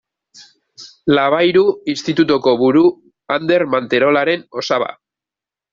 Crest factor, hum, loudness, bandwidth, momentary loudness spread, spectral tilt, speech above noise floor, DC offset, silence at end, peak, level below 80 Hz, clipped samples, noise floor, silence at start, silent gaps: 14 dB; none; -15 LUFS; 7.6 kHz; 8 LU; -5.5 dB/octave; 74 dB; under 0.1%; 0.8 s; -2 dBFS; -60 dBFS; under 0.1%; -88 dBFS; 0.4 s; none